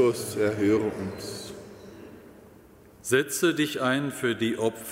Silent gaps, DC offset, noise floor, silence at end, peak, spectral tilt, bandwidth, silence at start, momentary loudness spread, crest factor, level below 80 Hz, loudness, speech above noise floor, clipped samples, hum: none; under 0.1%; -52 dBFS; 0 s; -10 dBFS; -4.5 dB/octave; 16 kHz; 0 s; 21 LU; 18 dB; -62 dBFS; -26 LUFS; 26 dB; under 0.1%; none